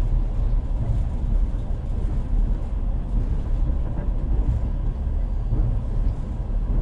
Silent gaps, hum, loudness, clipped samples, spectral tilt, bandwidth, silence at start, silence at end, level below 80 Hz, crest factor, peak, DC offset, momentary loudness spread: none; none; -27 LUFS; under 0.1%; -9.5 dB/octave; 3.4 kHz; 0 s; 0 s; -22 dBFS; 12 dB; -10 dBFS; under 0.1%; 3 LU